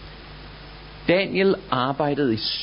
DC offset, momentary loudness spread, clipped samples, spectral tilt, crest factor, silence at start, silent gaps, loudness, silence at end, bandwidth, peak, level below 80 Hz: under 0.1%; 20 LU; under 0.1%; -9.5 dB/octave; 18 dB; 0 s; none; -22 LUFS; 0 s; 5.6 kHz; -4 dBFS; -48 dBFS